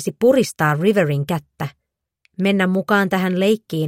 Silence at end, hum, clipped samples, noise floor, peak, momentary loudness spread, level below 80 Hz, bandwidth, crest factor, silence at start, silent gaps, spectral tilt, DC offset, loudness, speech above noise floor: 0 s; none; under 0.1%; -65 dBFS; -4 dBFS; 14 LU; -60 dBFS; 16.5 kHz; 14 dB; 0 s; none; -6 dB/octave; under 0.1%; -18 LUFS; 47 dB